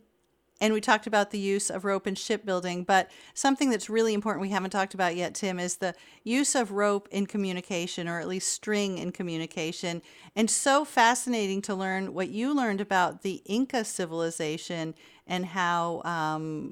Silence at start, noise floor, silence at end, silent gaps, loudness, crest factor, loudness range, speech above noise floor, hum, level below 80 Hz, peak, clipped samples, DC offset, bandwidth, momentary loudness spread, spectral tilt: 0.6 s; -71 dBFS; 0 s; none; -28 LUFS; 20 dB; 4 LU; 42 dB; none; -70 dBFS; -8 dBFS; under 0.1%; under 0.1%; 16.5 kHz; 9 LU; -3.5 dB/octave